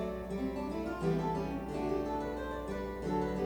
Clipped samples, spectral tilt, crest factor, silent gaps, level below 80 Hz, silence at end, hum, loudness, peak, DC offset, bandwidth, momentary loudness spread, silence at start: under 0.1%; -7.5 dB/octave; 14 dB; none; -48 dBFS; 0 s; none; -36 LUFS; -20 dBFS; under 0.1%; over 20 kHz; 5 LU; 0 s